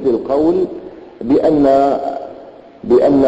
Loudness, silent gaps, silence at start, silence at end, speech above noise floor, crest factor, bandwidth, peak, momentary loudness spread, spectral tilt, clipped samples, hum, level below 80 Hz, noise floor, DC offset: -14 LUFS; none; 0 s; 0 s; 24 dB; 12 dB; 8 kHz; -2 dBFS; 20 LU; -8.5 dB/octave; under 0.1%; none; -44 dBFS; -37 dBFS; under 0.1%